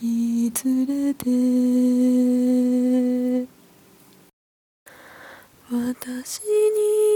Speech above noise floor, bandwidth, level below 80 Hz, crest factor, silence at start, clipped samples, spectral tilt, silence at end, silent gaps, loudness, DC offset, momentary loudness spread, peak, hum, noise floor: 30 dB; 19 kHz; -68 dBFS; 14 dB; 0 s; under 0.1%; -5 dB/octave; 0 s; 4.33-4.86 s; -21 LUFS; under 0.1%; 10 LU; -8 dBFS; none; -52 dBFS